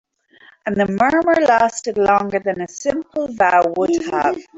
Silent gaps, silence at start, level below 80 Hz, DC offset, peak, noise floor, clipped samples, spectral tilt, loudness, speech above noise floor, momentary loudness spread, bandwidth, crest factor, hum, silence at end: none; 0.65 s; -52 dBFS; under 0.1%; -2 dBFS; -50 dBFS; under 0.1%; -5 dB/octave; -17 LUFS; 33 dB; 9 LU; 8 kHz; 16 dB; none; 0.15 s